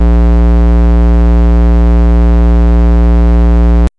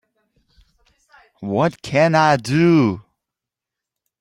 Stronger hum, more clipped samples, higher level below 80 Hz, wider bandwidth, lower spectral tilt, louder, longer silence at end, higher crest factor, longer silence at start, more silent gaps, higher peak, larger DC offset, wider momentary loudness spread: neither; neither; first, -6 dBFS vs -56 dBFS; second, 3.9 kHz vs 12 kHz; first, -9.5 dB/octave vs -6.5 dB/octave; first, -9 LUFS vs -17 LUFS; second, 0.1 s vs 1.2 s; second, 2 dB vs 18 dB; second, 0 s vs 1.4 s; neither; about the same, -4 dBFS vs -2 dBFS; neither; second, 0 LU vs 12 LU